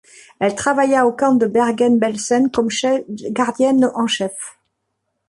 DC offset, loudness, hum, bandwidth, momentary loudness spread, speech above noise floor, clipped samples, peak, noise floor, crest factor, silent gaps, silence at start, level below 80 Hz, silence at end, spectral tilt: under 0.1%; -17 LUFS; none; 11.5 kHz; 7 LU; 57 dB; under 0.1%; -4 dBFS; -73 dBFS; 14 dB; none; 0.4 s; -58 dBFS; 0.8 s; -4 dB/octave